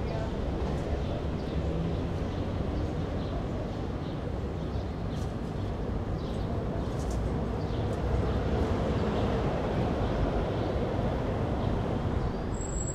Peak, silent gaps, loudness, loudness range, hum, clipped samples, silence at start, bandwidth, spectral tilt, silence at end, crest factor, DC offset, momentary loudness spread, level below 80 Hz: -16 dBFS; none; -32 LUFS; 4 LU; none; under 0.1%; 0 s; 10.5 kHz; -7 dB/octave; 0 s; 14 dB; under 0.1%; 5 LU; -36 dBFS